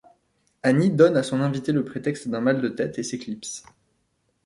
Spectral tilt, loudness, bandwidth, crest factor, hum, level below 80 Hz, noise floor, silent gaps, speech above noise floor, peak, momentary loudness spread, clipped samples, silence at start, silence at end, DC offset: -6 dB/octave; -23 LUFS; 11.5 kHz; 20 dB; none; -64 dBFS; -71 dBFS; none; 48 dB; -4 dBFS; 14 LU; under 0.1%; 0.65 s; 0.85 s; under 0.1%